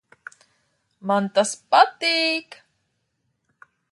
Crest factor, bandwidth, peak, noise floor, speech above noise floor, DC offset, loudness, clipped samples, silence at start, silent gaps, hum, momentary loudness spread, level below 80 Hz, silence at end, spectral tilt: 22 dB; 11.5 kHz; -2 dBFS; -73 dBFS; 53 dB; under 0.1%; -20 LUFS; under 0.1%; 1.05 s; none; none; 9 LU; -78 dBFS; 1.5 s; -3 dB/octave